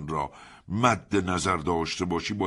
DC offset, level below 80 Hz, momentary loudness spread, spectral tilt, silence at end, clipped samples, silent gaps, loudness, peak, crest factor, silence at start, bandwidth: under 0.1%; -50 dBFS; 8 LU; -5 dB/octave; 0 s; under 0.1%; none; -27 LUFS; -6 dBFS; 20 dB; 0 s; 11.5 kHz